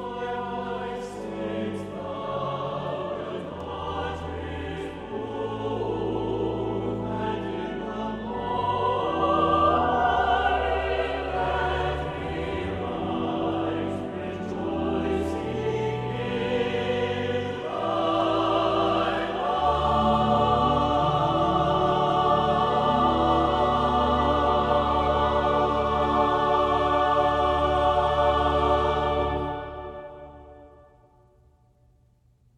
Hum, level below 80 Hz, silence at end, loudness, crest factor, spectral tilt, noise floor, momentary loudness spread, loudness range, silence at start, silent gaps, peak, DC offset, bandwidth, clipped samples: none; -40 dBFS; 1.9 s; -25 LUFS; 16 dB; -7 dB/octave; -61 dBFS; 11 LU; 9 LU; 0 s; none; -10 dBFS; under 0.1%; 11 kHz; under 0.1%